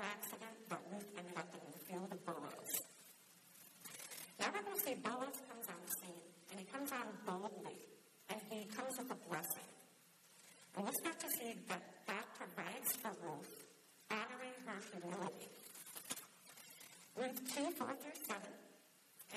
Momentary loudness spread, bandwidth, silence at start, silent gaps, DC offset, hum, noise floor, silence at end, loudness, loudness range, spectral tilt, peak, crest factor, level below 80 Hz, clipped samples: 19 LU; 14 kHz; 0 s; none; under 0.1%; none; -68 dBFS; 0 s; -47 LUFS; 4 LU; -3 dB/octave; -26 dBFS; 22 dB; under -90 dBFS; under 0.1%